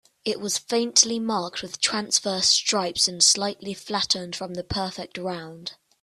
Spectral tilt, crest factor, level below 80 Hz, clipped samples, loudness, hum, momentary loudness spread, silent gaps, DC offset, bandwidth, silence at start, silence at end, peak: -1.5 dB/octave; 22 dB; -58 dBFS; under 0.1%; -22 LUFS; none; 14 LU; none; under 0.1%; 14.5 kHz; 0.25 s; 0.3 s; -2 dBFS